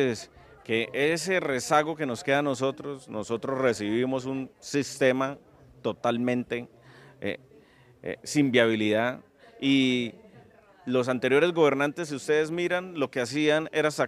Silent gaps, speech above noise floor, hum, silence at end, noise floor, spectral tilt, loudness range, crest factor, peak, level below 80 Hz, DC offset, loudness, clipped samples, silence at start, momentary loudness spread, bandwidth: none; 30 dB; none; 0 s; -56 dBFS; -4.5 dB/octave; 4 LU; 20 dB; -6 dBFS; -68 dBFS; under 0.1%; -27 LUFS; under 0.1%; 0 s; 14 LU; 14.5 kHz